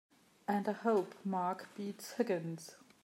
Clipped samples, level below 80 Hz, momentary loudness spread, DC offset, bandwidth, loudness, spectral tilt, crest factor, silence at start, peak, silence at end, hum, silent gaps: under 0.1%; under -90 dBFS; 12 LU; under 0.1%; 16 kHz; -38 LUFS; -6 dB/octave; 18 dB; 0.5 s; -20 dBFS; 0.25 s; none; none